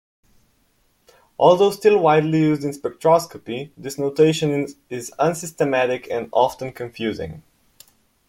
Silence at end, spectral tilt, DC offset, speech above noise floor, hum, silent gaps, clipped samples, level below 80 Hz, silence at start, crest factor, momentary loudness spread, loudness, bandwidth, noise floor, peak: 0.9 s; -5.5 dB/octave; under 0.1%; 44 dB; none; none; under 0.1%; -60 dBFS; 1.4 s; 18 dB; 15 LU; -20 LUFS; 16.5 kHz; -63 dBFS; -2 dBFS